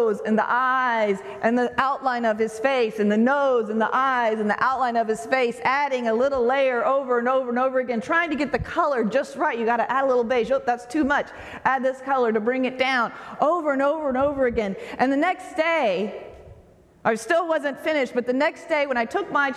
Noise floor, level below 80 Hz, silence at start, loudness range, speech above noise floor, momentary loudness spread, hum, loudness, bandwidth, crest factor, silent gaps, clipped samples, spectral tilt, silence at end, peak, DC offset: -52 dBFS; -54 dBFS; 0 s; 3 LU; 30 dB; 4 LU; none; -22 LUFS; 12.5 kHz; 16 dB; none; under 0.1%; -5 dB/octave; 0 s; -6 dBFS; under 0.1%